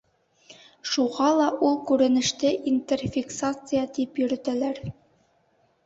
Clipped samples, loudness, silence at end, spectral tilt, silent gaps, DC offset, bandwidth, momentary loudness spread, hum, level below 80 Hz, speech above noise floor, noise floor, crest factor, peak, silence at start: under 0.1%; -25 LUFS; 0.95 s; -4.5 dB/octave; none; under 0.1%; 8 kHz; 8 LU; none; -58 dBFS; 42 dB; -66 dBFS; 18 dB; -8 dBFS; 0.5 s